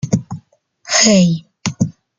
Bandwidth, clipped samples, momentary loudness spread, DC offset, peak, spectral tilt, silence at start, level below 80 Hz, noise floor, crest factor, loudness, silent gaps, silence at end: 9.8 kHz; under 0.1%; 19 LU; under 0.1%; 0 dBFS; -4 dB/octave; 0.05 s; -50 dBFS; -48 dBFS; 16 dB; -14 LUFS; none; 0.25 s